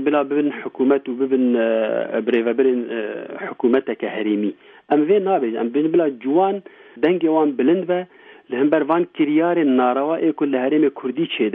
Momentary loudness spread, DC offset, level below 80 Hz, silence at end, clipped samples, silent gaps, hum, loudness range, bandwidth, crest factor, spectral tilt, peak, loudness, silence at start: 7 LU; under 0.1%; -72 dBFS; 0 s; under 0.1%; none; none; 2 LU; 3.9 kHz; 14 dB; -9.5 dB/octave; -4 dBFS; -19 LUFS; 0 s